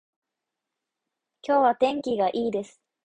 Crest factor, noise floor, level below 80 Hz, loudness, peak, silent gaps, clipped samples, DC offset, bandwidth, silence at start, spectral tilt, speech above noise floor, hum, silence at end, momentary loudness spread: 18 dB; -85 dBFS; -70 dBFS; -24 LUFS; -8 dBFS; none; under 0.1%; under 0.1%; 9.8 kHz; 1.45 s; -5.5 dB/octave; 62 dB; none; 0.4 s; 15 LU